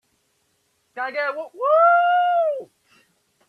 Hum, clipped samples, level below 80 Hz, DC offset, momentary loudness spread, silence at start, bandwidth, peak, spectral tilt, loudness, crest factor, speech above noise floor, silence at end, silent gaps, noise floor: none; under 0.1%; -84 dBFS; under 0.1%; 16 LU; 0.95 s; 4.9 kHz; -6 dBFS; -3 dB/octave; -19 LUFS; 16 dB; 49 dB; 0.85 s; none; -68 dBFS